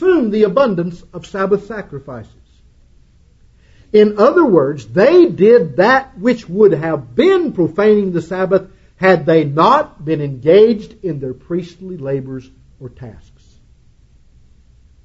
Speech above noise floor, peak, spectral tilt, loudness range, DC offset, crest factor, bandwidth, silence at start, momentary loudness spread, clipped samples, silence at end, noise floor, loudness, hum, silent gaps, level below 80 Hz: 35 dB; 0 dBFS; -7.5 dB/octave; 14 LU; under 0.1%; 14 dB; 7.8 kHz; 0 s; 18 LU; under 0.1%; 1.9 s; -48 dBFS; -13 LUFS; none; none; -48 dBFS